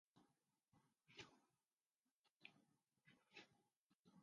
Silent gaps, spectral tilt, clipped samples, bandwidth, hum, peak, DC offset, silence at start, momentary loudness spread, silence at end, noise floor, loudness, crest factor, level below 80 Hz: 1.73-1.78 s, 1.95-1.99 s, 2.11-2.24 s, 2.30-2.40 s, 3.76-4.05 s; -2 dB/octave; under 0.1%; 7 kHz; none; -44 dBFS; under 0.1%; 0.15 s; 4 LU; 0 s; under -90 dBFS; -66 LUFS; 28 dB; under -90 dBFS